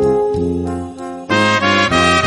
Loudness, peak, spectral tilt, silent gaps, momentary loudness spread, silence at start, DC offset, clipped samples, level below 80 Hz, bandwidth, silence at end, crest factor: -15 LUFS; 0 dBFS; -4.5 dB/octave; none; 14 LU; 0 s; under 0.1%; under 0.1%; -38 dBFS; 11.5 kHz; 0 s; 14 dB